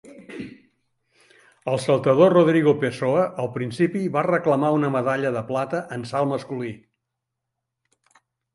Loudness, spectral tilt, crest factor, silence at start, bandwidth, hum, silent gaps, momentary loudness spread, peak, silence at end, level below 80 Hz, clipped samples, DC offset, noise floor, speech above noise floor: -21 LUFS; -7 dB/octave; 20 dB; 0.05 s; 11.5 kHz; none; none; 18 LU; -4 dBFS; 1.8 s; -66 dBFS; under 0.1%; under 0.1%; -82 dBFS; 61 dB